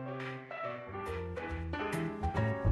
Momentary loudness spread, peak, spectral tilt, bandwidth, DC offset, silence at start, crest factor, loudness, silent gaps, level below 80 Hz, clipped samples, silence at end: 7 LU; -18 dBFS; -7 dB/octave; 12 kHz; under 0.1%; 0 s; 18 dB; -38 LUFS; none; -48 dBFS; under 0.1%; 0 s